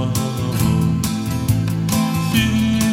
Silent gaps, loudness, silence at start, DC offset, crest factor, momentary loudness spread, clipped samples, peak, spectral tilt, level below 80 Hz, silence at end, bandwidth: none; -18 LUFS; 0 s; under 0.1%; 14 dB; 4 LU; under 0.1%; -4 dBFS; -5.5 dB/octave; -34 dBFS; 0 s; 16.5 kHz